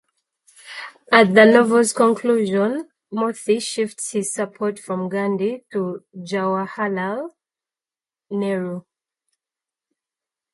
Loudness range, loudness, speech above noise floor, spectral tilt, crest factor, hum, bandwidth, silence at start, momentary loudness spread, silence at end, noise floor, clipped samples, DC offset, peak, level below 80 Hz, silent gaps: 12 LU; -19 LUFS; over 71 dB; -4.5 dB/octave; 20 dB; none; 11.5 kHz; 0.65 s; 17 LU; 1.75 s; under -90 dBFS; under 0.1%; under 0.1%; 0 dBFS; -70 dBFS; none